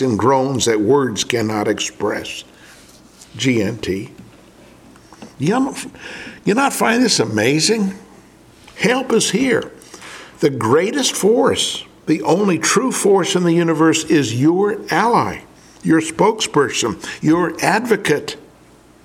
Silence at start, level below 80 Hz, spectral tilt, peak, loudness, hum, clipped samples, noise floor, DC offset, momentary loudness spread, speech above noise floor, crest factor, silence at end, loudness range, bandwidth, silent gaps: 0 s; -54 dBFS; -4 dB/octave; 0 dBFS; -17 LUFS; none; under 0.1%; -47 dBFS; under 0.1%; 12 LU; 31 dB; 16 dB; 0.65 s; 7 LU; 17 kHz; none